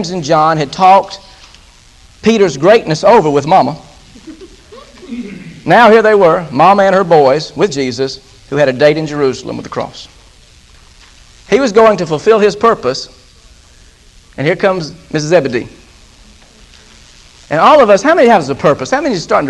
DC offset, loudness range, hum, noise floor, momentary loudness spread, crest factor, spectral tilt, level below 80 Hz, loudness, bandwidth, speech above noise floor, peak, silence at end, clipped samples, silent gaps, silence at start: under 0.1%; 8 LU; none; -42 dBFS; 16 LU; 12 dB; -5.5 dB/octave; -44 dBFS; -10 LUFS; 11.5 kHz; 32 dB; 0 dBFS; 0 s; 0.6%; none; 0 s